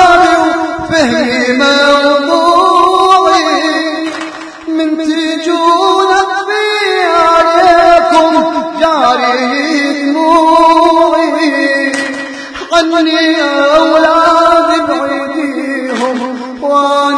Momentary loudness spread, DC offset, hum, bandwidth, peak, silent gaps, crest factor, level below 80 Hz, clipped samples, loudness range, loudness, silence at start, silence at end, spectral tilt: 9 LU; under 0.1%; none; 11 kHz; 0 dBFS; none; 10 dB; -44 dBFS; 0.9%; 3 LU; -9 LUFS; 0 s; 0 s; -3 dB/octave